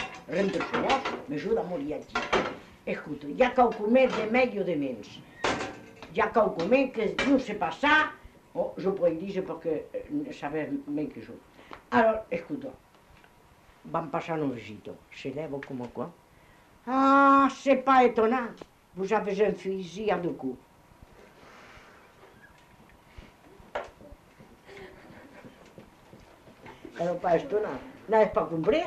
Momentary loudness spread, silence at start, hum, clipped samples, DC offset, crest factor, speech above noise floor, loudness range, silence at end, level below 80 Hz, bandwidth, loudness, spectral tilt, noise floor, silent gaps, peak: 19 LU; 0 s; none; under 0.1%; under 0.1%; 20 dB; 31 dB; 22 LU; 0 s; -58 dBFS; 12.5 kHz; -27 LUFS; -5.5 dB/octave; -57 dBFS; none; -10 dBFS